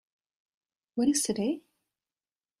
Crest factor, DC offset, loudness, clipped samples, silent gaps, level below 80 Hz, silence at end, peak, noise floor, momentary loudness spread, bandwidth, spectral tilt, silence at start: 20 dB; under 0.1%; -29 LUFS; under 0.1%; none; -70 dBFS; 1 s; -14 dBFS; under -90 dBFS; 12 LU; 14 kHz; -3.5 dB/octave; 0.95 s